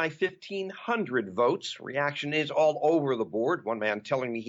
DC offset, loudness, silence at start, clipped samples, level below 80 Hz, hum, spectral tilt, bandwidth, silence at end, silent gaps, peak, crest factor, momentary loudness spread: under 0.1%; -28 LUFS; 0 s; under 0.1%; -76 dBFS; none; -5.5 dB/octave; 8 kHz; 0 s; none; -14 dBFS; 14 dB; 9 LU